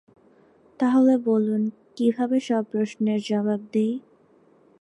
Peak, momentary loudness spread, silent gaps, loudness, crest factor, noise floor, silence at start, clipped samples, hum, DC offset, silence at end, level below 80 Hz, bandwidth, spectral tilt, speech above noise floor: -10 dBFS; 8 LU; none; -23 LUFS; 14 dB; -58 dBFS; 0.8 s; under 0.1%; none; under 0.1%; 0.8 s; -74 dBFS; 10.5 kHz; -7 dB/octave; 36 dB